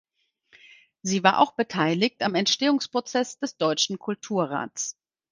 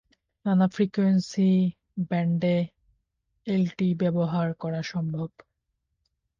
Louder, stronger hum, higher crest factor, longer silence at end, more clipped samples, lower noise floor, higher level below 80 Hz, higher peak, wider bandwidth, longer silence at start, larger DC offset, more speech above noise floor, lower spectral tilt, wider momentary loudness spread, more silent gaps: about the same, -25 LUFS vs -26 LUFS; neither; first, 24 dB vs 14 dB; second, 0.4 s vs 1.1 s; neither; second, -62 dBFS vs -79 dBFS; second, -72 dBFS vs -64 dBFS; first, -2 dBFS vs -12 dBFS; first, 10.5 kHz vs 7.4 kHz; first, 1.05 s vs 0.45 s; neither; second, 38 dB vs 55 dB; second, -3.5 dB/octave vs -8 dB/octave; about the same, 10 LU vs 11 LU; neither